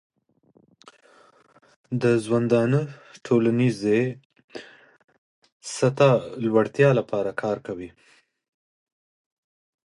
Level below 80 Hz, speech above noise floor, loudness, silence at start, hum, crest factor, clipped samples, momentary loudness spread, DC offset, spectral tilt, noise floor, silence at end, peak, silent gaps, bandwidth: -66 dBFS; 40 dB; -22 LUFS; 1.9 s; none; 20 dB; under 0.1%; 22 LU; under 0.1%; -7 dB/octave; -62 dBFS; 2 s; -4 dBFS; 4.25-4.30 s, 4.44-4.48 s, 5.04-5.08 s, 5.18-5.42 s, 5.52-5.60 s; 11.5 kHz